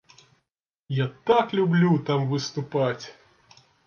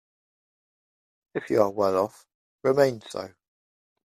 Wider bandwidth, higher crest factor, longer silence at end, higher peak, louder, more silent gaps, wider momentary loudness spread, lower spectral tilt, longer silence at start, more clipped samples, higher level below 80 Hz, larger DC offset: second, 7 kHz vs 15 kHz; about the same, 18 dB vs 22 dB; about the same, 0.75 s vs 0.8 s; about the same, -8 dBFS vs -6 dBFS; about the same, -24 LUFS vs -25 LUFS; second, none vs 2.34-2.59 s; second, 9 LU vs 15 LU; about the same, -6.5 dB/octave vs -6 dB/octave; second, 0.9 s vs 1.35 s; neither; about the same, -68 dBFS vs -70 dBFS; neither